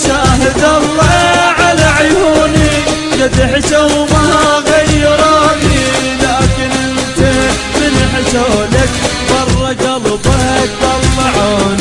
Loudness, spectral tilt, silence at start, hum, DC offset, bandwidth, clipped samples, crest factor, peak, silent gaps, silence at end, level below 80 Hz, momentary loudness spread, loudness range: -10 LUFS; -4.5 dB/octave; 0 s; none; 0.3%; 11.5 kHz; under 0.1%; 10 dB; 0 dBFS; none; 0 s; -22 dBFS; 5 LU; 2 LU